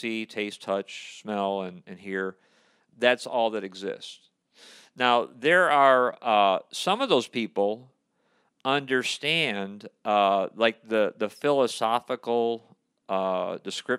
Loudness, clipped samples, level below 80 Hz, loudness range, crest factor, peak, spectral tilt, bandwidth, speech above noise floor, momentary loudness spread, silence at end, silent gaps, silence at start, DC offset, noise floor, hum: -25 LUFS; under 0.1%; -84 dBFS; 7 LU; 22 dB; -4 dBFS; -4 dB/octave; 14.5 kHz; 44 dB; 13 LU; 0 s; none; 0 s; under 0.1%; -70 dBFS; none